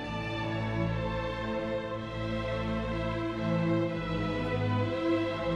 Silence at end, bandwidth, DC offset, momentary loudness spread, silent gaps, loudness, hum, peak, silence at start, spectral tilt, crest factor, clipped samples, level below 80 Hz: 0 s; 9 kHz; under 0.1%; 5 LU; none; -32 LUFS; none; -18 dBFS; 0 s; -7.5 dB/octave; 12 dB; under 0.1%; -46 dBFS